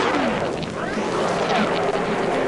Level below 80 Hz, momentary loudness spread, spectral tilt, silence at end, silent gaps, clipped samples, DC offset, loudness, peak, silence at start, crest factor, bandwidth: -48 dBFS; 5 LU; -5 dB/octave; 0 s; none; under 0.1%; under 0.1%; -22 LUFS; -6 dBFS; 0 s; 16 dB; 11.5 kHz